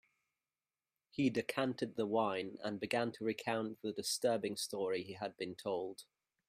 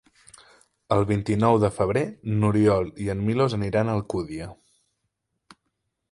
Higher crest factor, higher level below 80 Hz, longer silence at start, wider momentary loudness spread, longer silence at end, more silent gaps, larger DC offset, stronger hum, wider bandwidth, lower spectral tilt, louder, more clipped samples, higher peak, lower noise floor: about the same, 22 dB vs 20 dB; second, -80 dBFS vs -48 dBFS; first, 1.15 s vs 0.9 s; about the same, 8 LU vs 10 LU; second, 0.45 s vs 1.6 s; neither; neither; neither; first, 15.5 kHz vs 11.5 kHz; second, -4 dB/octave vs -7.5 dB/octave; second, -39 LUFS vs -24 LUFS; neither; second, -18 dBFS vs -6 dBFS; first, under -90 dBFS vs -78 dBFS